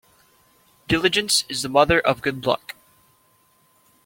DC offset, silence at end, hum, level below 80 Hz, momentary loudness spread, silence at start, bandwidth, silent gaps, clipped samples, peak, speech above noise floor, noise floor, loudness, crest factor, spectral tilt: under 0.1%; 1.5 s; none; -48 dBFS; 7 LU; 0.9 s; 17 kHz; none; under 0.1%; -2 dBFS; 40 dB; -61 dBFS; -20 LUFS; 22 dB; -3 dB/octave